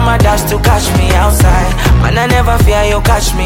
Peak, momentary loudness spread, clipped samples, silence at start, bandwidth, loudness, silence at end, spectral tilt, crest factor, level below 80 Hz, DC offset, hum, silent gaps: 0 dBFS; 2 LU; under 0.1%; 0 s; 17 kHz; -10 LUFS; 0 s; -5 dB/octave; 8 dB; -12 dBFS; under 0.1%; none; none